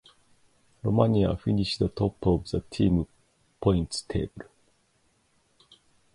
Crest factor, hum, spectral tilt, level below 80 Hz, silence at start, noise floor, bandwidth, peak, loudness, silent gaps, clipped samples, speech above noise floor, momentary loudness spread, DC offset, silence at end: 22 dB; none; -7 dB/octave; -44 dBFS; 0.85 s; -68 dBFS; 11.5 kHz; -6 dBFS; -27 LUFS; none; under 0.1%; 43 dB; 10 LU; under 0.1%; 1.7 s